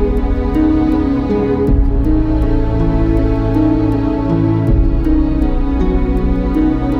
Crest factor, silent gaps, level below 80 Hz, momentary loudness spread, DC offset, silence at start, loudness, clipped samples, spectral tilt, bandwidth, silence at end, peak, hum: 10 dB; none; -16 dBFS; 3 LU; under 0.1%; 0 s; -15 LUFS; under 0.1%; -10 dB/octave; 5.6 kHz; 0 s; -2 dBFS; none